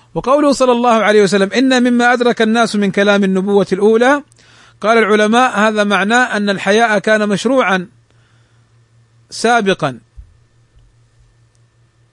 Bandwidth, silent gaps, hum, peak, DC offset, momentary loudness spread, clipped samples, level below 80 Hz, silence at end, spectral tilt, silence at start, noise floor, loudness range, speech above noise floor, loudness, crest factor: 11 kHz; none; none; 0 dBFS; under 0.1%; 6 LU; under 0.1%; -52 dBFS; 1.9 s; -4.5 dB/octave; 0.15 s; -53 dBFS; 9 LU; 41 dB; -12 LUFS; 14 dB